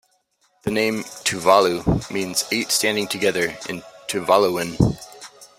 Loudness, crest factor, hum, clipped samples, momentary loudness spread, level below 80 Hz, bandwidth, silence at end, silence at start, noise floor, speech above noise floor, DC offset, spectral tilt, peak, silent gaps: -20 LUFS; 20 dB; none; under 0.1%; 15 LU; -42 dBFS; 16 kHz; 0.15 s; 0.65 s; -65 dBFS; 45 dB; under 0.1%; -4 dB/octave; -2 dBFS; none